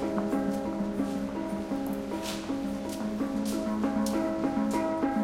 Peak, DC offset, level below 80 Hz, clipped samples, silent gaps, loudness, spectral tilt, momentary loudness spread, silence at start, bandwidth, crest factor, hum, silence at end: -14 dBFS; under 0.1%; -54 dBFS; under 0.1%; none; -31 LUFS; -6 dB/octave; 5 LU; 0 s; 16.5 kHz; 16 dB; none; 0 s